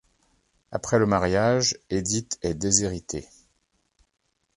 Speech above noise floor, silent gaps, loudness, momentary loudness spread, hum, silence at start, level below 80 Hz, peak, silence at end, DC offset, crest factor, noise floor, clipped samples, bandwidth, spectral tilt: 47 dB; none; -24 LUFS; 12 LU; none; 0.7 s; -48 dBFS; -4 dBFS; 1.35 s; under 0.1%; 24 dB; -71 dBFS; under 0.1%; 11.5 kHz; -4 dB/octave